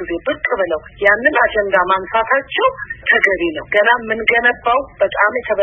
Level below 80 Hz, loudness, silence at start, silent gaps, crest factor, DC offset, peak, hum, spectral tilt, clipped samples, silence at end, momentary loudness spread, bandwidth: -44 dBFS; -15 LUFS; 0 s; none; 16 dB; under 0.1%; 0 dBFS; none; -5 dB/octave; under 0.1%; 0 s; 6 LU; 10.5 kHz